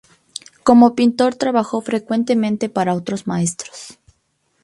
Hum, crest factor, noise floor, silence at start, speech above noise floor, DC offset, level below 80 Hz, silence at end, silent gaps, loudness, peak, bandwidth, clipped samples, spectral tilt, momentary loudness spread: none; 18 dB; -66 dBFS; 0.65 s; 49 dB; under 0.1%; -58 dBFS; 0.75 s; none; -17 LUFS; 0 dBFS; 11.5 kHz; under 0.1%; -5.5 dB/octave; 22 LU